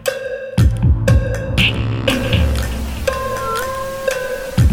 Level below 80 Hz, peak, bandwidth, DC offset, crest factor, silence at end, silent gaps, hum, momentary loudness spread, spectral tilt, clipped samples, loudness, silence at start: -22 dBFS; 0 dBFS; 17 kHz; under 0.1%; 16 dB; 0 s; none; none; 7 LU; -5.5 dB/octave; under 0.1%; -18 LUFS; 0 s